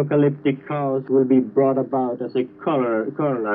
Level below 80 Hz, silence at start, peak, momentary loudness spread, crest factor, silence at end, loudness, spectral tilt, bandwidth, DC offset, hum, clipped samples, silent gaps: -72 dBFS; 0 s; -6 dBFS; 7 LU; 14 dB; 0 s; -21 LUFS; -12 dB/octave; 4.6 kHz; under 0.1%; none; under 0.1%; none